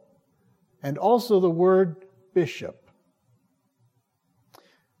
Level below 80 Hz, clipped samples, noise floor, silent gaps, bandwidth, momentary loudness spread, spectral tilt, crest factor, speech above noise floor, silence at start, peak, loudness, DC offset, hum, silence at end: -80 dBFS; under 0.1%; -71 dBFS; none; 15.5 kHz; 17 LU; -7.5 dB/octave; 16 dB; 49 dB; 0.85 s; -10 dBFS; -23 LUFS; under 0.1%; none; 2.3 s